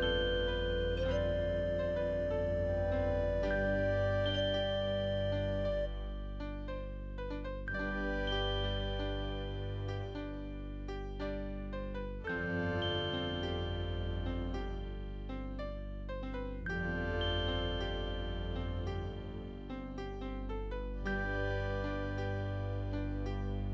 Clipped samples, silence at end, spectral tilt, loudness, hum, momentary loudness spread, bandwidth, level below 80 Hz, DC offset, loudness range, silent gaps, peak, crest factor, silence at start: under 0.1%; 0 s; -7 dB/octave; -37 LUFS; 50 Hz at -55 dBFS; 10 LU; 7.4 kHz; -42 dBFS; under 0.1%; 7 LU; none; -22 dBFS; 14 dB; 0 s